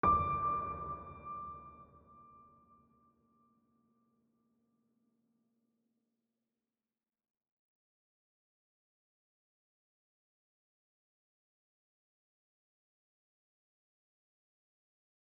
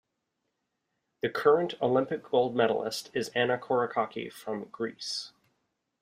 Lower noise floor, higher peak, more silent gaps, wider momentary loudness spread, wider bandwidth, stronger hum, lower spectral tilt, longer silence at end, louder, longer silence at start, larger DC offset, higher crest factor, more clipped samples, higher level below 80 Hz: first, under -90 dBFS vs -82 dBFS; second, -18 dBFS vs -8 dBFS; neither; first, 25 LU vs 12 LU; second, 4.8 kHz vs 15.5 kHz; neither; first, -7 dB/octave vs -4.5 dB/octave; first, 12.9 s vs 0.75 s; second, -37 LUFS vs -29 LUFS; second, 0.05 s vs 1.25 s; neither; about the same, 26 dB vs 22 dB; neither; first, -62 dBFS vs -74 dBFS